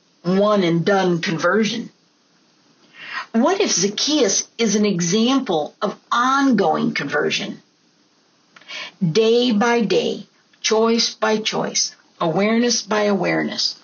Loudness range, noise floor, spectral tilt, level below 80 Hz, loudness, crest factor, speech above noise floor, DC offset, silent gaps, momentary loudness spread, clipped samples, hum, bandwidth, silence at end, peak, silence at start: 3 LU; -59 dBFS; -3.5 dB/octave; -70 dBFS; -18 LUFS; 14 dB; 40 dB; under 0.1%; none; 10 LU; under 0.1%; none; 7.4 kHz; 0.1 s; -4 dBFS; 0.25 s